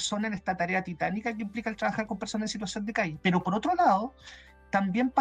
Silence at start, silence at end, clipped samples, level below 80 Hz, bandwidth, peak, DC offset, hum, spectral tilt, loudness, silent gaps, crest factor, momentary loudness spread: 0 s; 0 s; under 0.1%; -58 dBFS; 10 kHz; -12 dBFS; under 0.1%; none; -5 dB/octave; -29 LUFS; none; 18 dB; 9 LU